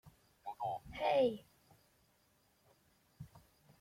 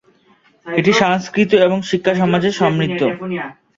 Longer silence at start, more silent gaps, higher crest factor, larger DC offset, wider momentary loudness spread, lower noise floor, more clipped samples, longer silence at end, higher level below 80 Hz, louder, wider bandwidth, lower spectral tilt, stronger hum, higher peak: second, 0.05 s vs 0.65 s; neither; about the same, 20 dB vs 16 dB; neither; first, 24 LU vs 9 LU; first, -74 dBFS vs -54 dBFS; neither; first, 0.45 s vs 0.25 s; second, -70 dBFS vs -54 dBFS; second, -37 LUFS vs -16 LUFS; first, 16 kHz vs 7.8 kHz; about the same, -6 dB/octave vs -6 dB/octave; neither; second, -22 dBFS vs 0 dBFS